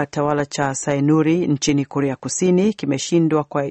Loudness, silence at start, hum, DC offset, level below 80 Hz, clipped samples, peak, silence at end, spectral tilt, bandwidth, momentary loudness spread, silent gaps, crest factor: -19 LUFS; 0 s; none; under 0.1%; -54 dBFS; under 0.1%; -4 dBFS; 0 s; -5.5 dB/octave; 8.8 kHz; 5 LU; none; 14 dB